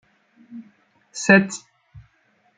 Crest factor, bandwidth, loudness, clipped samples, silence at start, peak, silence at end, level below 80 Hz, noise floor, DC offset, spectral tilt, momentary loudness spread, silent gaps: 22 dB; 9.4 kHz; -18 LUFS; under 0.1%; 0.5 s; -2 dBFS; 1 s; -62 dBFS; -63 dBFS; under 0.1%; -5 dB/octave; 27 LU; none